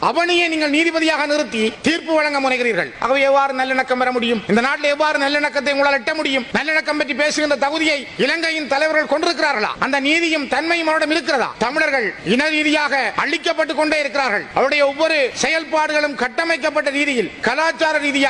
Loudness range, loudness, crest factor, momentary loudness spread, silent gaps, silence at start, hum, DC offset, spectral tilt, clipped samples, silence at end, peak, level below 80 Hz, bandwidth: 1 LU; -17 LUFS; 16 dB; 3 LU; none; 0 s; none; under 0.1%; -3 dB/octave; under 0.1%; 0 s; -2 dBFS; -56 dBFS; 11 kHz